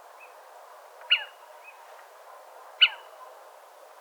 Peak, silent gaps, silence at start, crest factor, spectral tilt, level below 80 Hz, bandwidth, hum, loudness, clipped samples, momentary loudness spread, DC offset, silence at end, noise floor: -6 dBFS; none; 1.05 s; 26 dB; 5.5 dB/octave; under -90 dBFS; over 20 kHz; none; -23 LUFS; under 0.1%; 27 LU; under 0.1%; 0.75 s; -51 dBFS